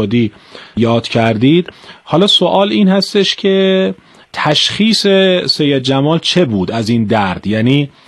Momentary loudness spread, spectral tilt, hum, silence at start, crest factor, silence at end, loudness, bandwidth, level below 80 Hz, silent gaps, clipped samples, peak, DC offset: 7 LU; -5.5 dB/octave; none; 0 s; 12 dB; 0.2 s; -12 LUFS; 12.5 kHz; -50 dBFS; none; under 0.1%; 0 dBFS; under 0.1%